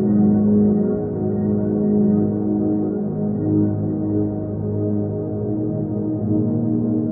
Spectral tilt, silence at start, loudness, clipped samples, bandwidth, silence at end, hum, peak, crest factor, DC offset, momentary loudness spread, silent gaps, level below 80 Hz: -16 dB/octave; 0 s; -20 LUFS; under 0.1%; 2 kHz; 0 s; none; -8 dBFS; 12 dB; under 0.1%; 7 LU; none; -46 dBFS